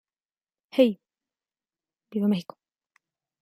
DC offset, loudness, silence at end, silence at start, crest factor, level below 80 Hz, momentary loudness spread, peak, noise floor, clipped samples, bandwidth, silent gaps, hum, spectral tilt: under 0.1%; -26 LUFS; 1 s; 0.75 s; 24 dB; -78 dBFS; 17 LU; -6 dBFS; under -90 dBFS; under 0.1%; 15 kHz; none; none; -7.5 dB/octave